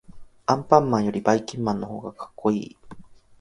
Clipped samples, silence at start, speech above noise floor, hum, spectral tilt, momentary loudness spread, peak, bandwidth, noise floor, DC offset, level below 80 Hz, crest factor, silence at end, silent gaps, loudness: under 0.1%; 0.1 s; 21 dB; none; -6.5 dB/octave; 16 LU; 0 dBFS; 11 kHz; -44 dBFS; under 0.1%; -56 dBFS; 24 dB; 0.25 s; none; -23 LUFS